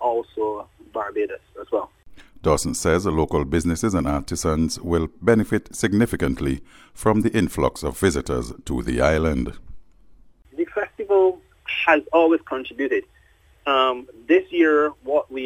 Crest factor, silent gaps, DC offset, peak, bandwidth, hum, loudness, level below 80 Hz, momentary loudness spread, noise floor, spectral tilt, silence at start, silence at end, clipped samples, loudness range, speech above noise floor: 18 dB; none; under 0.1%; -4 dBFS; 17 kHz; none; -22 LUFS; -38 dBFS; 11 LU; -55 dBFS; -5.5 dB/octave; 0 s; 0 s; under 0.1%; 3 LU; 34 dB